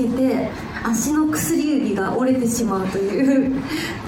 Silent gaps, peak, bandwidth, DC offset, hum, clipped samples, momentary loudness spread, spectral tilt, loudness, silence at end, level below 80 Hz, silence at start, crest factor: none; -6 dBFS; 19.5 kHz; under 0.1%; none; under 0.1%; 6 LU; -5 dB/octave; -20 LUFS; 0 s; -46 dBFS; 0 s; 14 dB